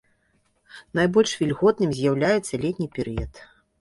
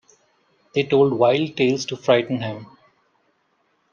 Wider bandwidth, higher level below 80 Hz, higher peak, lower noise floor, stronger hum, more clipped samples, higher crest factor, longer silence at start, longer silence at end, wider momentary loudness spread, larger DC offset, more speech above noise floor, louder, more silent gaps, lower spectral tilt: first, 11.5 kHz vs 7.2 kHz; first, -46 dBFS vs -66 dBFS; about the same, -6 dBFS vs -4 dBFS; about the same, -67 dBFS vs -67 dBFS; neither; neither; about the same, 18 dB vs 18 dB; about the same, 0.75 s vs 0.75 s; second, 0.35 s vs 1.25 s; about the same, 10 LU vs 10 LU; neither; about the same, 44 dB vs 47 dB; second, -23 LUFS vs -20 LUFS; neither; about the same, -5.5 dB/octave vs -5.5 dB/octave